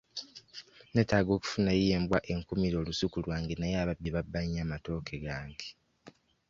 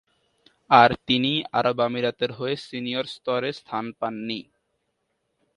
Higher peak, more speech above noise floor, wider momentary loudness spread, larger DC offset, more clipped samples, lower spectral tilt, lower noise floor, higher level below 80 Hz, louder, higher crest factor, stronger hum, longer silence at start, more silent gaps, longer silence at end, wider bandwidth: second, -12 dBFS vs 0 dBFS; second, 27 dB vs 52 dB; about the same, 16 LU vs 15 LU; neither; neither; about the same, -6 dB/octave vs -6 dB/octave; second, -58 dBFS vs -75 dBFS; first, -48 dBFS vs -60 dBFS; second, -32 LUFS vs -23 LUFS; about the same, 22 dB vs 24 dB; neither; second, 0.15 s vs 0.7 s; neither; second, 0.4 s vs 1.15 s; second, 7.6 kHz vs 11 kHz